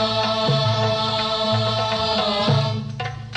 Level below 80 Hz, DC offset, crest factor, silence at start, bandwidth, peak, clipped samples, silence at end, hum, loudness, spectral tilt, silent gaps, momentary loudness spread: -48 dBFS; under 0.1%; 14 dB; 0 s; 9.6 kHz; -8 dBFS; under 0.1%; 0 s; none; -20 LUFS; -5.5 dB/octave; none; 6 LU